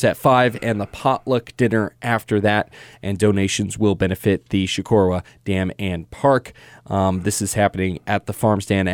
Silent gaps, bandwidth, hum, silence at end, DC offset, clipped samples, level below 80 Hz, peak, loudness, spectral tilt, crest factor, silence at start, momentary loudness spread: none; 18.5 kHz; none; 0 s; under 0.1%; under 0.1%; -48 dBFS; -4 dBFS; -20 LUFS; -5.5 dB/octave; 16 dB; 0 s; 7 LU